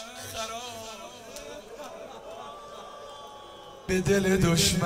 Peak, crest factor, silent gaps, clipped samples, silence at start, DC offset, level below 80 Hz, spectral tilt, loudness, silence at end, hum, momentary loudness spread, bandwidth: -10 dBFS; 20 dB; none; under 0.1%; 0 s; under 0.1%; -48 dBFS; -4 dB/octave; -27 LUFS; 0 s; none; 20 LU; 16 kHz